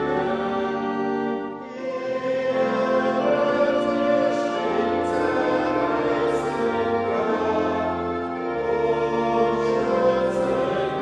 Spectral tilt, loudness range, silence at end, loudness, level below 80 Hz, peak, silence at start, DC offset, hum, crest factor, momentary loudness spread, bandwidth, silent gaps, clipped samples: -6.5 dB/octave; 2 LU; 0 s; -23 LUFS; -54 dBFS; -8 dBFS; 0 s; under 0.1%; none; 14 dB; 6 LU; 10 kHz; none; under 0.1%